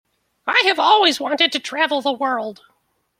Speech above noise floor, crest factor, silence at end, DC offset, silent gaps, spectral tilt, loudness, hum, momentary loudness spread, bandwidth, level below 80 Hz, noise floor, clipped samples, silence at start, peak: 48 dB; 18 dB; 0.65 s; under 0.1%; none; -1 dB/octave; -17 LUFS; none; 11 LU; 16 kHz; -72 dBFS; -66 dBFS; under 0.1%; 0.45 s; -2 dBFS